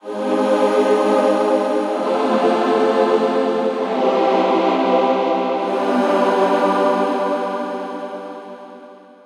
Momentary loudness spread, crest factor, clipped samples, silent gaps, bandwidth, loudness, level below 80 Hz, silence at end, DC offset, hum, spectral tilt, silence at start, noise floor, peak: 10 LU; 14 dB; under 0.1%; none; 11 kHz; -17 LUFS; -78 dBFS; 0.25 s; under 0.1%; none; -5.5 dB/octave; 0.05 s; -41 dBFS; -4 dBFS